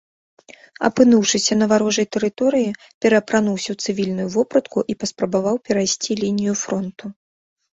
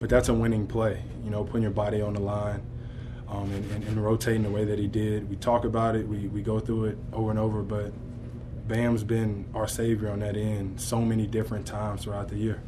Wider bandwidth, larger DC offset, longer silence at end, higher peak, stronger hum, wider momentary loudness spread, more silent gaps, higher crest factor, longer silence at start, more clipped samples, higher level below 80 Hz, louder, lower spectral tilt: second, 8 kHz vs 13.5 kHz; neither; first, 0.6 s vs 0 s; first, -2 dBFS vs -8 dBFS; neither; about the same, 9 LU vs 9 LU; first, 2.94-3.01 s vs none; about the same, 18 dB vs 20 dB; first, 0.8 s vs 0 s; neither; second, -58 dBFS vs -42 dBFS; first, -19 LUFS vs -29 LUFS; second, -4 dB/octave vs -7 dB/octave